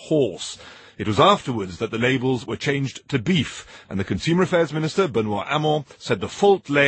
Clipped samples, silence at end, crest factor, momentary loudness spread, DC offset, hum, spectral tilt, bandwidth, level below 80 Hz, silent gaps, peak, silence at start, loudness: under 0.1%; 0 s; 20 dB; 13 LU; under 0.1%; none; -5.5 dB/octave; 8.8 kHz; -54 dBFS; none; -2 dBFS; 0 s; -22 LUFS